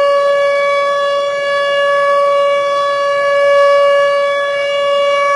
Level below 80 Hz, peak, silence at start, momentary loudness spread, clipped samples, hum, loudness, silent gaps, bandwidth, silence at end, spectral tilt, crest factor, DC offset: -62 dBFS; -2 dBFS; 0 s; 5 LU; under 0.1%; none; -12 LUFS; none; 11 kHz; 0 s; -1.5 dB/octave; 10 dB; under 0.1%